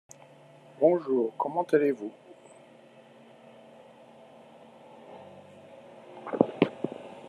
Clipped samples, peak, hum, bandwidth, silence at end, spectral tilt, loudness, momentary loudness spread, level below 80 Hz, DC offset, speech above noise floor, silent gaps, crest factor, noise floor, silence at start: under 0.1%; -4 dBFS; none; 12 kHz; 0 s; -7 dB/octave; -28 LUFS; 26 LU; -82 dBFS; under 0.1%; 28 dB; none; 28 dB; -54 dBFS; 0.8 s